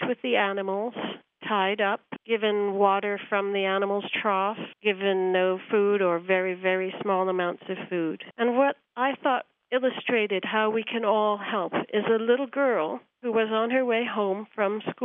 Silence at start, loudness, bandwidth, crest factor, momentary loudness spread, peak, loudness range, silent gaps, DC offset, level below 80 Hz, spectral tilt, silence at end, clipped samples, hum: 0 s; -26 LUFS; 3.9 kHz; 18 dB; 7 LU; -8 dBFS; 1 LU; none; under 0.1%; -86 dBFS; -8 dB/octave; 0 s; under 0.1%; none